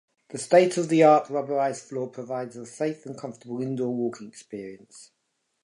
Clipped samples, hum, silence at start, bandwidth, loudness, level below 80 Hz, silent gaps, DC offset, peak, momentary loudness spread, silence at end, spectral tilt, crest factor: under 0.1%; none; 0.3 s; 11.5 kHz; -24 LUFS; -78 dBFS; none; under 0.1%; -6 dBFS; 20 LU; 0.6 s; -5.5 dB/octave; 20 dB